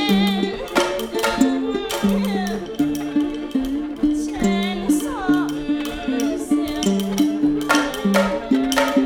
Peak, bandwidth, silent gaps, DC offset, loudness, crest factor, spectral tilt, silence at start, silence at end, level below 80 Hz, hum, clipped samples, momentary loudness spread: -2 dBFS; 18.5 kHz; none; under 0.1%; -21 LUFS; 18 dB; -5 dB/octave; 0 s; 0 s; -42 dBFS; none; under 0.1%; 5 LU